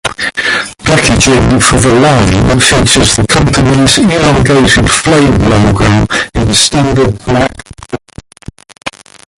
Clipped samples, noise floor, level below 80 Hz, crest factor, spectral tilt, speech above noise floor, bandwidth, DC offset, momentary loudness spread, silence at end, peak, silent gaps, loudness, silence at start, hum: 0.2%; -33 dBFS; -22 dBFS; 8 dB; -4 dB/octave; 26 dB; 16 kHz; under 0.1%; 9 LU; 0.45 s; 0 dBFS; none; -7 LUFS; 0.05 s; none